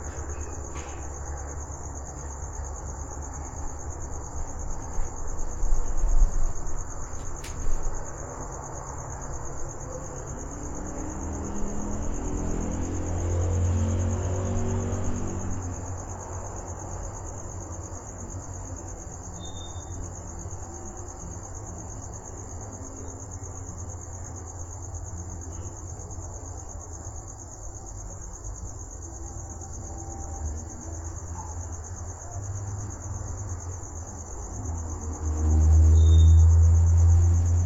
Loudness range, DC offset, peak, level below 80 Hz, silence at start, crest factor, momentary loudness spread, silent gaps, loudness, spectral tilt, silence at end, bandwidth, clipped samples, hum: 11 LU; under 0.1%; -10 dBFS; -32 dBFS; 0 s; 18 dB; 16 LU; none; -30 LUFS; -6 dB/octave; 0 s; 7.8 kHz; under 0.1%; none